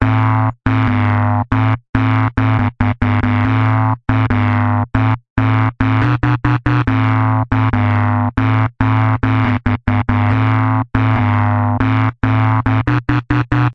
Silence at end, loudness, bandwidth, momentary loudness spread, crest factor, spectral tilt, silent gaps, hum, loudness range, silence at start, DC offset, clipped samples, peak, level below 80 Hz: 0 s; -15 LUFS; 5.2 kHz; 2 LU; 14 dB; -9.5 dB/octave; 1.89-1.93 s, 5.30-5.36 s; none; 0 LU; 0 s; 0.1%; under 0.1%; 0 dBFS; -30 dBFS